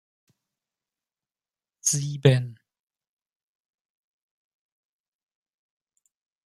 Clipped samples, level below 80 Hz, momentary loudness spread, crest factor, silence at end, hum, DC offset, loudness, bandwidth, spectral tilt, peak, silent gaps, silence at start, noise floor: under 0.1%; -70 dBFS; 7 LU; 28 dB; 3.95 s; none; under 0.1%; -23 LUFS; 14 kHz; -4.5 dB/octave; -2 dBFS; none; 1.85 s; under -90 dBFS